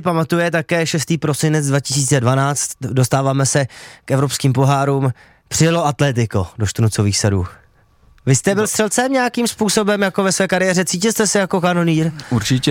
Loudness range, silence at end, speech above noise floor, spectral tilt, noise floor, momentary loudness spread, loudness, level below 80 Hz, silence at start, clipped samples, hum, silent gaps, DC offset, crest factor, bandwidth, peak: 2 LU; 0 s; 35 dB; -4.5 dB/octave; -51 dBFS; 5 LU; -17 LUFS; -50 dBFS; 0 s; under 0.1%; none; none; under 0.1%; 14 dB; 17 kHz; -2 dBFS